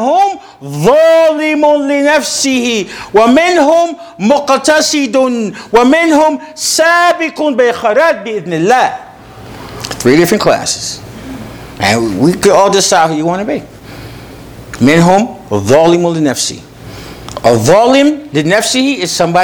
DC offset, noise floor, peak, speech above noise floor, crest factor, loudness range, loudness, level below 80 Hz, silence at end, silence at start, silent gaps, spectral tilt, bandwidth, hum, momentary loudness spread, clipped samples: under 0.1%; -31 dBFS; 0 dBFS; 22 dB; 10 dB; 3 LU; -10 LUFS; -42 dBFS; 0 s; 0 s; none; -4 dB/octave; over 20 kHz; none; 19 LU; 0.5%